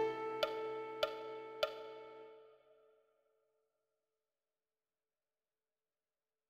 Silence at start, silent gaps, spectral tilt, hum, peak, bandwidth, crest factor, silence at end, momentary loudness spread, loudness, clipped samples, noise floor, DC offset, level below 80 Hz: 0 s; none; -3.5 dB/octave; none; -22 dBFS; 15.5 kHz; 26 dB; 3.75 s; 17 LU; -42 LUFS; under 0.1%; under -90 dBFS; under 0.1%; -82 dBFS